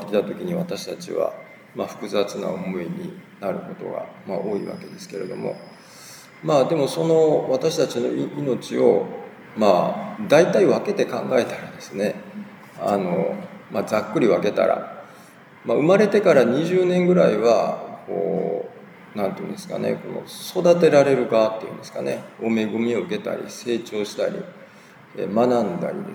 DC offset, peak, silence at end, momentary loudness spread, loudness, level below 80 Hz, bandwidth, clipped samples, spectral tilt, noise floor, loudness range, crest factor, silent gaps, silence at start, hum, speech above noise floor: under 0.1%; -2 dBFS; 0 s; 17 LU; -22 LUFS; -74 dBFS; 19.5 kHz; under 0.1%; -6 dB/octave; -47 dBFS; 9 LU; 20 dB; none; 0 s; none; 26 dB